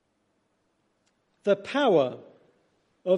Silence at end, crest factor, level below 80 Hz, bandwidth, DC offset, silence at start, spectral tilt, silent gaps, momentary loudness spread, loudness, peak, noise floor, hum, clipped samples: 0 s; 18 dB; -80 dBFS; 9.4 kHz; under 0.1%; 1.45 s; -6 dB/octave; none; 14 LU; -26 LUFS; -10 dBFS; -73 dBFS; none; under 0.1%